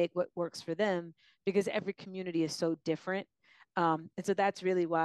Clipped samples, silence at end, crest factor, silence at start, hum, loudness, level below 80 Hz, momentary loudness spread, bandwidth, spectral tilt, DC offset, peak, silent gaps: under 0.1%; 0 s; 18 dB; 0 s; none; -34 LUFS; -80 dBFS; 9 LU; 12.5 kHz; -5.5 dB/octave; under 0.1%; -16 dBFS; none